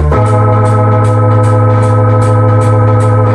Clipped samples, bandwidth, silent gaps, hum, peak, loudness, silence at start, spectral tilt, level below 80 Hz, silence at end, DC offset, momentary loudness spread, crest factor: under 0.1%; 10 kHz; none; none; 0 dBFS; -8 LUFS; 0 s; -8.5 dB/octave; -24 dBFS; 0 s; under 0.1%; 0 LU; 6 dB